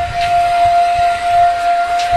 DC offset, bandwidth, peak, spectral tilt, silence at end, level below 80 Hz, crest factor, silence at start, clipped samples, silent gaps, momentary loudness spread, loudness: under 0.1%; 12.5 kHz; -4 dBFS; -3 dB/octave; 0 s; -36 dBFS; 10 dB; 0 s; under 0.1%; none; 3 LU; -13 LUFS